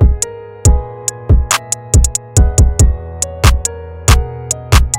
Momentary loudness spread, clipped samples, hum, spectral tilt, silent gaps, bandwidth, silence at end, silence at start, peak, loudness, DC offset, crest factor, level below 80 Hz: 9 LU; 0.6%; none; -4 dB/octave; none; 17 kHz; 0 s; 0 s; 0 dBFS; -14 LUFS; under 0.1%; 12 dB; -14 dBFS